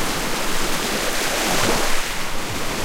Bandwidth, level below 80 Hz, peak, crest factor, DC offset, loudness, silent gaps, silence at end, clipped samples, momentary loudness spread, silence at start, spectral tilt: 16.5 kHz; -28 dBFS; -6 dBFS; 14 dB; under 0.1%; -21 LUFS; none; 0 s; under 0.1%; 7 LU; 0 s; -2 dB/octave